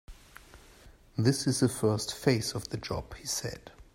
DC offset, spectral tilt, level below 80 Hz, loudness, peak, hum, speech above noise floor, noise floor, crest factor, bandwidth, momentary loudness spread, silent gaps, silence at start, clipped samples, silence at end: under 0.1%; -5 dB/octave; -54 dBFS; -30 LUFS; -10 dBFS; none; 26 dB; -55 dBFS; 22 dB; 16 kHz; 11 LU; none; 0.1 s; under 0.1%; 0.1 s